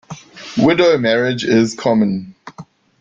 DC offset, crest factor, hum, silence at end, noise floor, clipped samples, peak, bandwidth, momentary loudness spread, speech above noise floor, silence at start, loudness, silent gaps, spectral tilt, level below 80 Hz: under 0.1%; 16 dB; none; 0.4 s; -40 dBFS; under 0.1%; -2 dBFS; 7.8 kHz; 19 LU; 25 dB; 0.1 s; -15 LUFS; none; -5.5 dB/octave; -54 dBFS